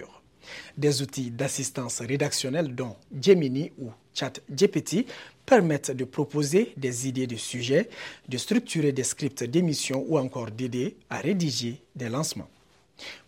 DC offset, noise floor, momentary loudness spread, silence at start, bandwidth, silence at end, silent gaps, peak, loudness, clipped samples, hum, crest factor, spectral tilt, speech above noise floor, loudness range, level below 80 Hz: under 0.1%; -48 dBFS; 13 LU; 0 s; 16.5 kHz; 0.1 s; none; -4 dBFS; -27 LUFS; under 0.1%; none; 22 dB; -4.5 dB/octave; 22 dB; 3 LU; -68 dBFS